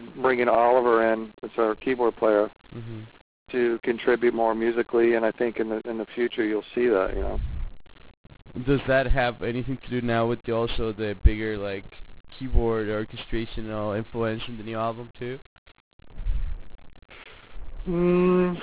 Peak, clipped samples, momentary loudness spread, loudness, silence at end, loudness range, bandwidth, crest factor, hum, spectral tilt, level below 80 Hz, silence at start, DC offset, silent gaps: -6 dBFS; under 0.1%; 17 LU; -25 LUFS; 0 s; 8 LU; 4 kHz; 20 dB; none; -10.5 dB/octave; -34 dBFS; 0 s; 0.1%; 3.21-3.46 s, 8.17-8.24 s, 12.20-12.24 s, 15.46-15.66 s, 15.80-15.99 s